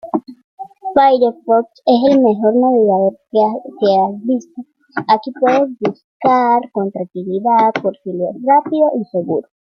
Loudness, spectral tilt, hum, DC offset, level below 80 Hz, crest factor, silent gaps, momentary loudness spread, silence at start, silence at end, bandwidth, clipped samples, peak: -15 LUFS; -7.5 dB/octave; none; under 0.1%; -62 dBFS; 14 dB; 0.44-0.58 s, 6.04-6.20 s; 11 LU; 0.05 s; 0.25 s; 6.6 kHz; under 0.1%; -2 dBFS